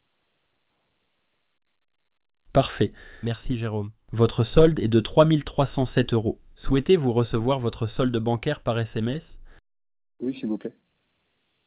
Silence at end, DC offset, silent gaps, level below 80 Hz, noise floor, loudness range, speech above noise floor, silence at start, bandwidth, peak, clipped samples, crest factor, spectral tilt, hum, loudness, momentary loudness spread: 0.95 s; under 0.1%; none; -42 dBFS; -75 dBFS; 9 LU; 52 dB; 2.55 s; 4 kHz; -4 dBFS; under 0.1%; 22 dB; -11.5 dB/octave; none; -24 LUFS; 14 LU